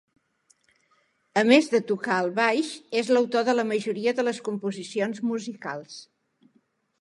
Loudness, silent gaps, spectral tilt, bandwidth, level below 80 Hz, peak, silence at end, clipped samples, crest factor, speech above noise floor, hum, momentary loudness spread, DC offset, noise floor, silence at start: -25 LUFS; none; -4.5 dB/octave; 11.5 kHz; -80 dBFS; -4 dBFS; 0.95 s; under 0.1%; 22 dB; 43 dB; none; 15 LU; under 0.1%; -68 dBFS; 1.35 s